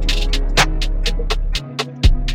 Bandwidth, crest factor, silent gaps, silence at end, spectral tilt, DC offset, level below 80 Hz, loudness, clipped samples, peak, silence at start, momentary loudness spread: 15 kHz; 16 dB; none; 0 s; -3.5 dB/octave; under 0.1%; -18 dBFS; -20 LUFS; under 0.1%; 0 dBFS; 0 s; 7 LU